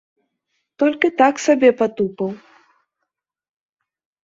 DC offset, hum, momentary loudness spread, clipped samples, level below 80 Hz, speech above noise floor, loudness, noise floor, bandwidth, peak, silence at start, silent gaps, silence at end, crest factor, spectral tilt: under 0.1%; none; 12 LU; under 0.1%; -66 dBFS; 63 dB; -17 LUFS; -79 dBFS; 7.8 kHz; -2 dBFS; 0.8 s; none; 1.85 s; 18 dB; -5 dB/octave